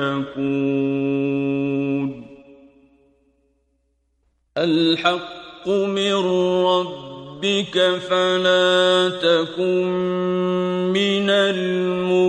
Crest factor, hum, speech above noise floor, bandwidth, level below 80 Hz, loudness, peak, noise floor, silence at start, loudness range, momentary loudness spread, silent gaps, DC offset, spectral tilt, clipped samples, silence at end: 16 dB; none; 48 dB; 10 kHz; -62 dBFS; -20 LUFS; -4 dBFS; -67 dBFS; 0 s; 8 LU; 9 LU; none; under 0.1%; -5.5 dB/octave; under 0.1%; 0 s